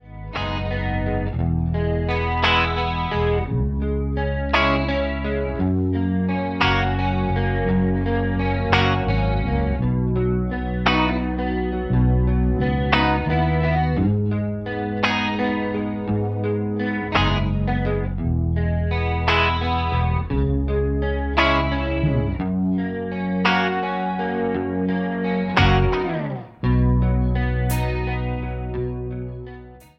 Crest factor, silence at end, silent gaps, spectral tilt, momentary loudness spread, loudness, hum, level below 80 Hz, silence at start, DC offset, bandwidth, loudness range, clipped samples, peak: 20 dB; 0.2 s; none; -7.5 dB/octave; 7 LU; -22 LUFS; none; -28 dBFS; 0.05 s; under 0.1%; 16 kHz; 2 LU; under 0.1%; 0 dBFS